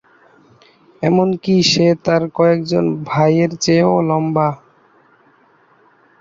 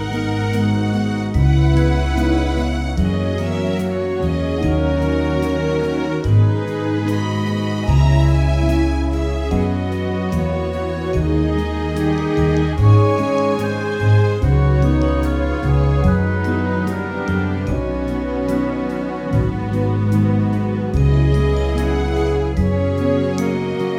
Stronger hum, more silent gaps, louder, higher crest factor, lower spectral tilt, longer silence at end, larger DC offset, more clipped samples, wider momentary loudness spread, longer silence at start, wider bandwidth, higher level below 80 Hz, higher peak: neither; neither; first, -15 LUFS vs -18 LUFS; about the same, 16 dB vs 16 dB; second, -5.5 dB/octave vs -8 dB/octave; first, 1.65 s vs 0 s; neither; neither; about the same, 5 LU vs 6 LU; first, 1 s vs 0 s; second, 7.8 kHz vs 12 kHz; second, -54 dBFS vs -24 dBFS; about the same, -2 dBFS vs -2 dBFS